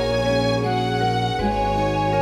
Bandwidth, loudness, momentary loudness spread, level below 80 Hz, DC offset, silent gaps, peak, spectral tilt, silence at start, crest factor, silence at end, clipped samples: 13.5 kHz; -21 LUFS; 2 LU; -36 dBFS; under 0.1%; none; -8 dBFS; -6 dB/octave; 0 s; 12 dB; 0 s; under 0.1%